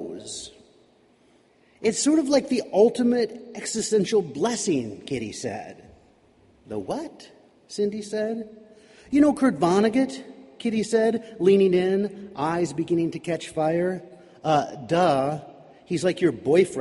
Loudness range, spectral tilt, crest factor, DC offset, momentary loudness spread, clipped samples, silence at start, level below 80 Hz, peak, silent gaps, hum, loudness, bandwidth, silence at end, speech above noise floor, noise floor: 10 LU; -5 dB/octave; 18 dB; under 0.1%; 15 LU; under 0.1%; 0 s; -62 dBFS; -6 dBFS; none; none; -24 LUFS; 11.5 kHz; 0 s; 36 dB; -59 dBFS